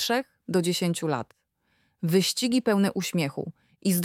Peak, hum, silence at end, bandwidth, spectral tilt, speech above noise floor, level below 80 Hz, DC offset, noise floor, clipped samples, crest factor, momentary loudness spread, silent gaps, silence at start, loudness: -10 dBFS; none; 0 s; 17 kHz; -4.5 dB/octave; 45 dB; -70 dBFS; under 0.1%; -71 dBFS; under 0.1%; 18 dB; 10 LU; none; 0 s; -26 LUFS